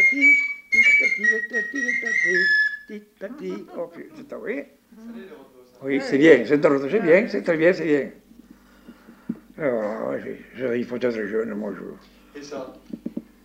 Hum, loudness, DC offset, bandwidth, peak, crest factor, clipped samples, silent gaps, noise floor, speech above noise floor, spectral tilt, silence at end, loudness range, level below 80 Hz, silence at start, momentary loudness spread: none; -20 LUFS; under 0.1%; 15.5 kHz; -2 dBFS; 20 dB; under 0.1%; none; -50 dBFS; 28 dB; -5 dB/octave; 0.25 s; 10 LU; -62 dBFS; 0 s; 22 LU